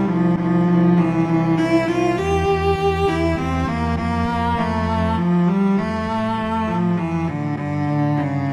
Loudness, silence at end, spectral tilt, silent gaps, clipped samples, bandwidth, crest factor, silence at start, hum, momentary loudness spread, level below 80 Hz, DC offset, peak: -19 LUFS; 0 s; -8 dB/octave; none; under 0.1%; 10 kHz; 14 dB; 0 s; none; 5 LU; -36 dBFS; under 0.1%; -6 dBFS